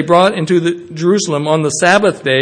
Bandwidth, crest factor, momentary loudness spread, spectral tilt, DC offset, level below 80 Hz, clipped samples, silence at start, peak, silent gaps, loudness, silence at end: 9.8 kHz; 12 dB; 4 LU; -4.5 dB/octave; under 0.1%; -56 dBFS; 0.2%; 0 s; 0 dBFS; none; -13 LUFS; 0 s